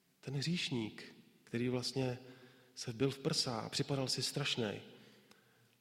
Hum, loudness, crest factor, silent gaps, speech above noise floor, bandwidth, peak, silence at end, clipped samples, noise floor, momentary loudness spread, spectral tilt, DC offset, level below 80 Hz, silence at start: none; -38 LUFS; 20 dB; none; 29 dB; 16.5 kHz; -20 dBFS; 0.7 s; under 0.1%; -68 dBFS; 16 LU; -4.5 dB/octave; under 0.1%; -74 dBFS; 0.25 s